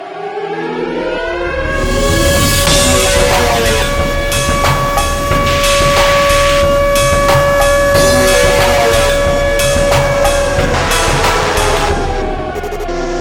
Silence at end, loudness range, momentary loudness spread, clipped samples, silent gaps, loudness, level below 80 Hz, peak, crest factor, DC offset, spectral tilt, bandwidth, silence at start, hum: 0 s; 3 LU; 9 LU; under 0.1%; none; -11 LUFS; -20 dBFS; 0 dBFS; 12 dB; under 0.1%; -3.5 dB/octave; 18 kHz; 0 s; none